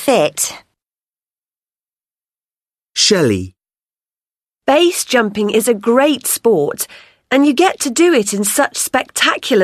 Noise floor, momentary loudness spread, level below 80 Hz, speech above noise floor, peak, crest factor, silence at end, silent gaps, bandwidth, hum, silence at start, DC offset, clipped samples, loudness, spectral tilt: under -90 dBFS; 8 LU; -58 dBFS; over 76 dB; 0 dBFS; 16 dB; 0 s; none; 13.5 kHz; none; 0 s; under 0.1%; under 0.1%; -14 LUFS; -3 dB/octave